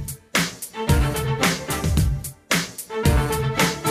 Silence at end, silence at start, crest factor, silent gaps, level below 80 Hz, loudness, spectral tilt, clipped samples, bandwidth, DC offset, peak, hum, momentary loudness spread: 0 s; 0 s; 14 dB; none; -28 dBFS; -22 LUFS; -4.5 dB/octave; under 0.1%; 16 kHz; under 0.1%; -8 dBFS; none; 6 LU